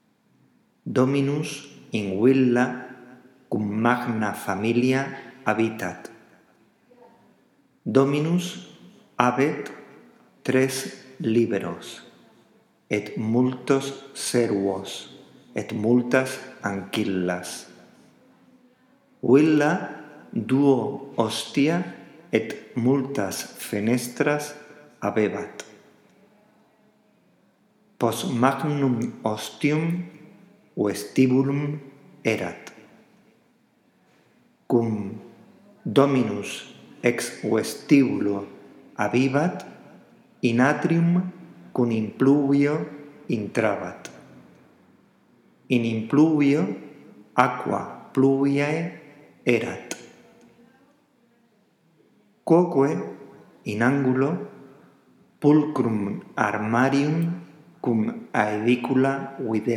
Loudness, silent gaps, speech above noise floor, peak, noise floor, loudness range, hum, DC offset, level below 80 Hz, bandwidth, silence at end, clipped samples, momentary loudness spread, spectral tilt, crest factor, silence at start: -24 LUFS; none; 40 dB; 0 dBFS; -63 dBFS; 6 LU; none; under 0.1%; -76 dBFS; 16 kHz; 0 s; under 0.1%; 17 LU; -6 dB/octave; 24 dB; 0.85 s